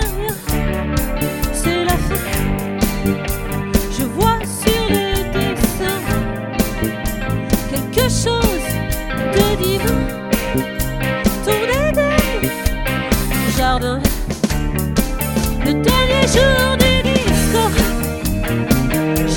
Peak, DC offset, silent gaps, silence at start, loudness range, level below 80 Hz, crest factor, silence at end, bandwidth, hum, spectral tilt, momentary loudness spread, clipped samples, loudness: 0 dBFS; under 0.1%; none; 0 s; 4 LU; -24 dBFS; 16 dB; 0 s; 17.5 kHz; none; -4.5 dB/octave; 7 LU; under 0.1%; -17 LUFS